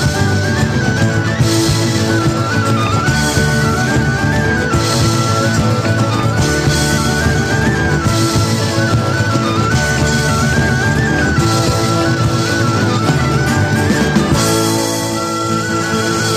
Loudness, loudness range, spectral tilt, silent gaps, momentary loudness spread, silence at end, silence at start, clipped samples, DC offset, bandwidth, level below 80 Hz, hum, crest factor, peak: -14 LUFS; 0 LU; -5 dB/octave; none; 2 LU; 0 s; 0 s; under 0.1%; under 0.1%; 14.5 kHz; -28 dBFS; none; 12 dB; -2 dBFS